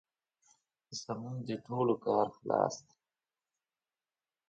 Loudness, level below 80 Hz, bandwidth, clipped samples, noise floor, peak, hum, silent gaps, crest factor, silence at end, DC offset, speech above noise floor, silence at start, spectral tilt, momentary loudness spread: -35 LUFS; -78 dBFS; 8.8 kHz; under 0.1%; under -90 dBFS; -14 dBFS; none; none; 24 dB; 1.7 s; under 0.1%; over 56 dB; 0.9 s; -6 dB/octave; 13 LU